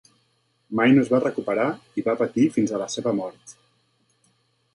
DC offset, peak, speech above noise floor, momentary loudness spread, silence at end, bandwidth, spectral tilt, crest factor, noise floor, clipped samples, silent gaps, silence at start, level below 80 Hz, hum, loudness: under 0.1%; -6 dBFS; 46 dB; 10 LU; 1.25 s; 11.5 kHz; -6 dB/octave; 18 dB; -68 dBFS; under 0.1%; none; 0.7 s; -66 dBFS; none; -23 LUFS